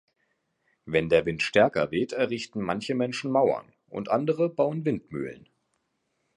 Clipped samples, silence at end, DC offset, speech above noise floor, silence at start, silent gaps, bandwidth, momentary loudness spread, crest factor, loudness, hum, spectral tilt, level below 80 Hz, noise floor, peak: under 0.1%; 1 s; under 0.1%; 50 dB; 0.85 s; none; 11 kHz; 12 LU; 20 dB; -26 LUFS; none; -6 dB/octave; -60 dBFS; -76 dBFS; -6 dBFS